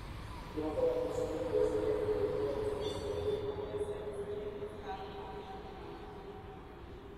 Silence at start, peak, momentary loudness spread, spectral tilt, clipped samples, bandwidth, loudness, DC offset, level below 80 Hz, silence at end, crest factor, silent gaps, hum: 0 s; -22 dBFS; 15 LU; -6.5 dB/octave; under 0.1%; 14 kHz; -37 LUFS; under 0.1%; -52 dBFS; 0 s; 16 dB; none; none